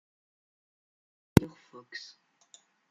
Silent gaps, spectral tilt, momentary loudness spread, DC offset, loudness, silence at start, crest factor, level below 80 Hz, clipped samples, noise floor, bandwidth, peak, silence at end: none; -6.5 dB/octave; 20 LU; under 0.1%; -26 LUFS; 1.4 s; 32 dB; -52 dBFS; under 0.1%; -62 dBFS; 11.5 kHz; -2 dBFS; 1.45 s